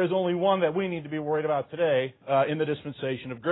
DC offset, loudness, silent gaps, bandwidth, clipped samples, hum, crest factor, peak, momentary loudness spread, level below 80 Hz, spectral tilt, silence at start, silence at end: under 0.1%; -27 LUFS; none; 4.1 kHz; under 0.1%; none; 16 dB; -12 dBFS; 8 LU; -68 dBFS; -10.5 dB/octave; 0 s; 0 s